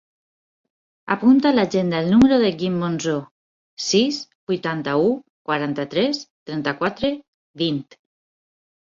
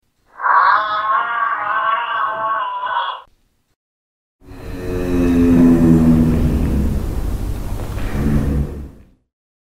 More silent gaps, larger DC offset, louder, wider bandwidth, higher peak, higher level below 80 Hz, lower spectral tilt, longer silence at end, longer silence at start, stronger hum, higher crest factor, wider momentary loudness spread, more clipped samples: first, 3.31-3.77 s, 4.35-4.47 s, 5.30-5.45 s, 6.30-6.46 s, 7.28-7.54 s vs 3.76-4.39 s; neither; second, -21 LUFS vs -17 LUFS; second, 7.6 kHz vs 15.5 kHz; second, -4 dBFS vs 0 dBFS; second, -54 dBFS vs -26 dBFS; second, -5.5 dB/octave vs -7.5 dB/octave; first, 1 s vs 0.75 s; first, 1.05 s vs 0.35 s; neither; about the same, 16 dB vs 18 dB; about the same, 13 LU vs 15 LU; neither